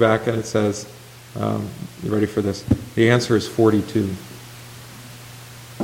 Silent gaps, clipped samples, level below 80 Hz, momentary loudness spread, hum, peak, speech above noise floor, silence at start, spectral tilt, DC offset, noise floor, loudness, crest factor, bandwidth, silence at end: none; under 0.1%; -48 dBFS; 21 LU; none; -2 dBFS; 19 dB; 0 s; -6 dB/octave; under 0.1%; -39 dBFS; -21 LUFS; 20 dB; 17 kHz; 0 s